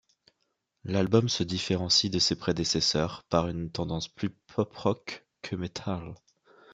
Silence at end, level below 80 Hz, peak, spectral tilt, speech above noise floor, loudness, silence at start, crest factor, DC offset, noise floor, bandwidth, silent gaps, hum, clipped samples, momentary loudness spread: 0 s; -58 dBFS; -8 dBFS; -4.5 dB/octave; 50 dB; -28 LUFS; 0.85 s; 22 dB; under 0.1%; -79 dBFS; 11 kHz; none; none; under 0.1%; 13 LU